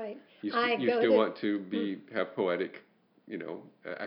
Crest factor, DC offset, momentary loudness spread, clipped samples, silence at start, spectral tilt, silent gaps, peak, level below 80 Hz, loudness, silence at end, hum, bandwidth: 18 dB; under 0.1%; 17 LU; under 0.1%; 0 s; -9 dB/octave; none; -12 dBFS; under -90 dBFS; -30 LUFS; 0 s; none; 5.6 kHz